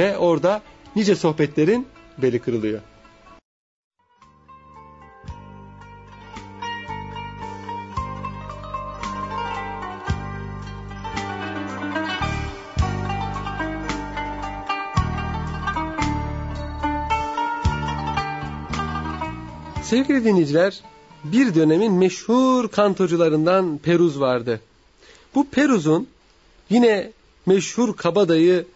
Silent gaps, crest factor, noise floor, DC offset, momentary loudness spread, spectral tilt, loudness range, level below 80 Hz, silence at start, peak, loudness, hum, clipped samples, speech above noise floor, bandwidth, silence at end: 3.45-3.91 s; 18 dB; -55 dBFS; under 0.1%; 16 LU; -6 dB/octave; 14 LU; -38 dBFS; 0 s; -4 dBFS; -22 LUFS; none; under 0.1%; 36 dB; 8 kHz; 0.1 s